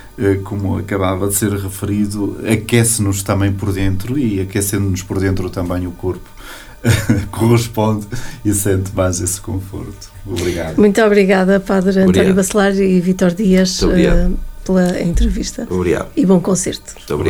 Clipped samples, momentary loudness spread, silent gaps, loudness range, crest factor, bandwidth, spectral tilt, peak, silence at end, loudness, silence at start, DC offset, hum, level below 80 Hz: under 0.1%; 10 LU; none; 6 LU; 14 dB; 18 kHz; -5.5 dB/octave; 0 dBFS; 0 s; -15 LUFS; 0 s; under 0.1%; none; -26 dBFS